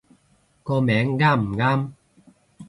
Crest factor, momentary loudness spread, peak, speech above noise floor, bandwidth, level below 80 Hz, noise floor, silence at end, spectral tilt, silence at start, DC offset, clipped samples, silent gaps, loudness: 18 dB; 11 LU; -6 dBFS; 42 dB; 10.5 kHz; -54 dBFS; -62 dBFS; 0.05 s; -8 dB/octave; 0.65 s; under 0.1%; under 0.1%; none; -21 LUFS